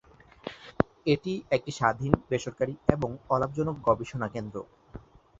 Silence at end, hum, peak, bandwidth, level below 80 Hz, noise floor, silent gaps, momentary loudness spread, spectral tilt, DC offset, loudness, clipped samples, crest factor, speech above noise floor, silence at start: 0.4 s; none; -2 dBFS; 8 kHz; -50 dBFS; -49 dBFS; none; 17 LU; -6.5 dB/octave; under 0.1%; -29 LUFS; under 0.1%; 28 dB; 20 dB; 0.45 s